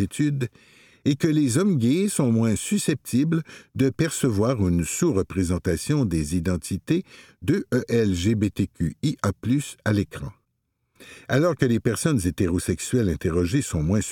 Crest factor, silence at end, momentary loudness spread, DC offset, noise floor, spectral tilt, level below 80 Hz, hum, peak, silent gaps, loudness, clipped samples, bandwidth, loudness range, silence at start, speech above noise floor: 18 dB; 0 s; 6 LU; under 0.1%; -75 dBFS; -6 dB/octave; -44 dBFS; none; -4 dBFS; none; -24 LUFS; under 0.1%; 18 kHz; 3 LU; 0 s; 52 dB